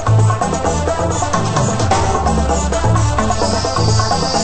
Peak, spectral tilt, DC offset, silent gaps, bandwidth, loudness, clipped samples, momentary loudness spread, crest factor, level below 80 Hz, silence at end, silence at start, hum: 0 dBFS; -5 dB/octave; under 0.1%; none; 8.8 kHz; -15 LUFS; under 0.1%; 3 LU; 14 dB; -24 dBFS; 0 s; 0 s; none